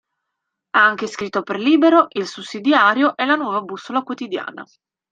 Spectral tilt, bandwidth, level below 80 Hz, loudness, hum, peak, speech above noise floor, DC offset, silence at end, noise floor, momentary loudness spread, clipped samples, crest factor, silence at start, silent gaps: -4.5 dB/octave; 8.8 kHz; -70 dBFS; -18 LUFS; none; -2 dBFS; 61 dB; under 0.1%; 0.5 s; -79 dBFS; 13 LU; under 0.1%; 18 dB; 0.75 s; none